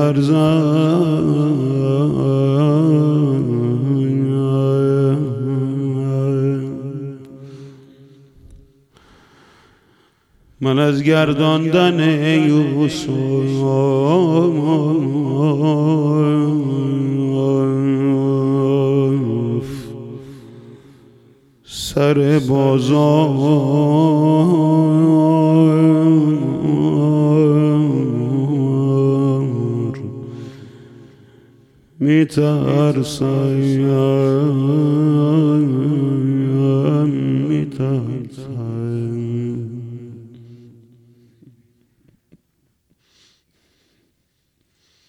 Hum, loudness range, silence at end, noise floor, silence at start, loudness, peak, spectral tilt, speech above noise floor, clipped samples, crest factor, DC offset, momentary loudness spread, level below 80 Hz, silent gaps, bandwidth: none; 10 LU; 4.55 s; -67 dBFS; 0 s; -16 LUFS; -2 dBFS; -8 dB/octave; 52 dB; under 0.1%; 14 dB; under 0.1%; 12 LU; -54 dBFS; none; 12 kHz